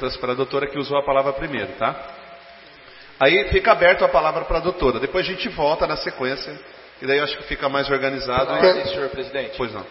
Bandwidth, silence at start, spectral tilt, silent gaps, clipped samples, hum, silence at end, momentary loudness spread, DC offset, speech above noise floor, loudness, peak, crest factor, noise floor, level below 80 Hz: 6 kHz; 0 s; -8 dB/octave; none; under 0.1%; none; 0 s; 11 LU; under 0.1%; 24 dB; -20 LUFS; 0 dBFS; 20 dB; -44 dBFS; -40 dBFS